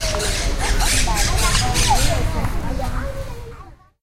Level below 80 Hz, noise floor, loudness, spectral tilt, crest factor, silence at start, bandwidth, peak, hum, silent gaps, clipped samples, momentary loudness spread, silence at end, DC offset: -22 dBFS; -40 dBFS; -20 LUFS; -3 dB/octave; 16 dB; 0 s; 16.5 kHz; -4 dBFS; none; none; under 0.1%; 14 LU; 0.3 s; under 0.1%